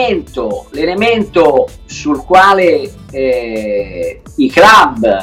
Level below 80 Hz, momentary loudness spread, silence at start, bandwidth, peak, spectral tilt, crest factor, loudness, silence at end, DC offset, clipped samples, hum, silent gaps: -36 dBFS; 15 LU; 0 s; 16.5 kHz; 0 dBFS; -4.5 dB/octave; 10 dB; -11 LUFS; 0 s; under 0.1%; under 0.1%; none; none